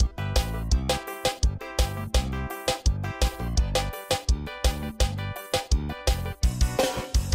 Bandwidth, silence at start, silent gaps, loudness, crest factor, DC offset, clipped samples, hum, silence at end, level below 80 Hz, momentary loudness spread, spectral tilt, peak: 16 kHz; 0 s; none; -28 LUFS; 14 dB; under 0.1%; under 0.1%; none; 0 s; -28 dBFS; 3 LU; -4.5 dB/octave; -12 dBFS